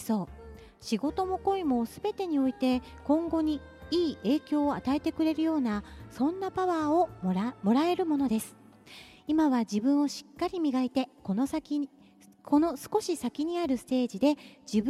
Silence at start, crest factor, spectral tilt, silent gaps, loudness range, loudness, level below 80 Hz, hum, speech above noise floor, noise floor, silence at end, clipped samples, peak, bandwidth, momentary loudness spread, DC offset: 0 s; 16 dB; -6 dB/octave; none; 2 LU; -29 LUFS; -56 dBFS; none; 23 dB; -52 dBFS; 0 s; under 0.1%; -14 dBFS; 14 kHz; 8 LU; under 0.1%